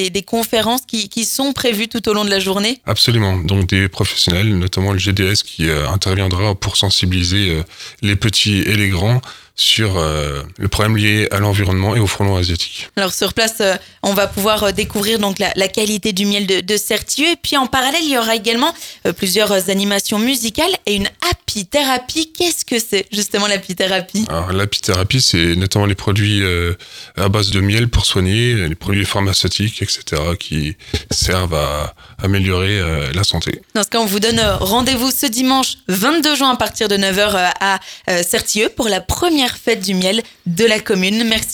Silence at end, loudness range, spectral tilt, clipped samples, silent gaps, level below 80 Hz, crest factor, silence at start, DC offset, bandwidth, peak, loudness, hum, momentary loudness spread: 0 s; 2 LU; -4 dB/octave; under 0.1%; none; -34 dBFS; 16 dB; 0 s; under 0.1%; 19.5 kHz; 0 dBFS; -15 LUFS; none; 6 LU